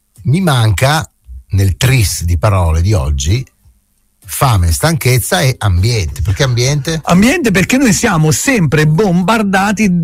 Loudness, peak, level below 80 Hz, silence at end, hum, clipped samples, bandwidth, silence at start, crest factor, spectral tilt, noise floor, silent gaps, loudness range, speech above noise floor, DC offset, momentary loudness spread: -12 LUFS; 0 dBFS; -26 dBFS; 0 s; none; under 0.1%; 16 kHz; 0.2 s; 12 dB; -5 dB/octave; -56 dBFS; none; 3 LU; 45 dB; under 0.1%; 6 LU